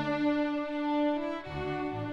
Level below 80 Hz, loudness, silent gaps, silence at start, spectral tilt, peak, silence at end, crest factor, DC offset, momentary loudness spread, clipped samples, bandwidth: -56 dBFS; -32 LUFS; none; 0 s; -7.5 dB/octave; -20 dBFS; 0 s; 12 dB; under 0.1%; 7 LU; under 0.1%; 6.6 kHz